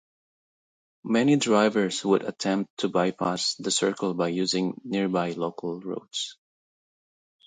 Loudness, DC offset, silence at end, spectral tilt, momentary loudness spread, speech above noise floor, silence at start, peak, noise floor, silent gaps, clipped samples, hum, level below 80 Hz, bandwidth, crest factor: -26 LUFS; under 0.1%; 1.15 s; -4.5 dB/octave; 11 LU; over 65 dB; 1.05 s; -8 dBFS; under -90 dBFS; 2.70-2.77 s; under 0.1%; none; -72 dBFS; 9.6 kHz; 18 dB